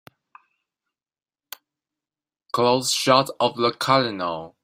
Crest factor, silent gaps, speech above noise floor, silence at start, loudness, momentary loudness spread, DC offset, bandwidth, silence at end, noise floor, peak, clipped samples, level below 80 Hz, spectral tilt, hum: 22 dB; none; over 69 dB; 2.55 s; -21 LUFS; 23 LU; under 0.1%; 16 kHz; 0.15 s; under -90 dBFS; -2 dBFS; under 0.1%; -66 dBFS; -3.5 dB/octave; none